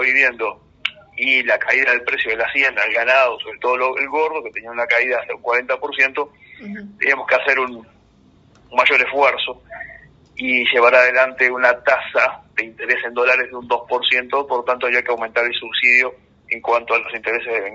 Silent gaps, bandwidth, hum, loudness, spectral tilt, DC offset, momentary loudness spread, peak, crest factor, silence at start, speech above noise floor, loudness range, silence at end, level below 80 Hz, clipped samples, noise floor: none; 7.8 kHz; none; -17 LUFS; 1.5 dB/octave; under 0.1%; 13 LU; 0 dBFS; 18 dB; 0 s; 34 dB; 4 LU; 0 s; -60 dBFS; under 0.1%; -52 dBFS